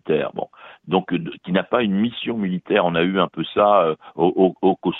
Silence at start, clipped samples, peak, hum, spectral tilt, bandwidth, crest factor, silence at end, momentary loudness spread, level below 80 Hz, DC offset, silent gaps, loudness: 0.05 s; under 0.1%; -2 dBFS; none; -10 dB/octave; 4.1 kHz; 18 dB; 0 s; 9 LU; -58 dBFS; under 0.1%; none; -20 LUFS